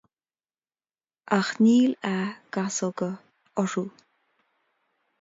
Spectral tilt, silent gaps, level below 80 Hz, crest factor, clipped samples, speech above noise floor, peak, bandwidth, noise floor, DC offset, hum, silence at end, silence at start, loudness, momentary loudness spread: -5 dB/octave; none; -74 dBFS; 22 dB; under 0.1%; over 66 dB; -6 dBFS; 7.8 kHz; under -90 dBFS; under 0.1%; none; 1.3 s; 1.3 s; -26 LUFS; 14 LU